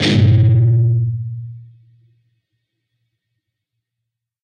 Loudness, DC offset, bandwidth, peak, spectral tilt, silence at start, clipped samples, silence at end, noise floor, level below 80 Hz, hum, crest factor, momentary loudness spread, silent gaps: -14 LUFS; under 0.1%; 8.8 kHz; -2 dBFS; -7 dB/octave; 0 s; under 0.1%; 2.8 s; -80 dBFS; -46 dBFS; none; 16 dB; 18 LU; none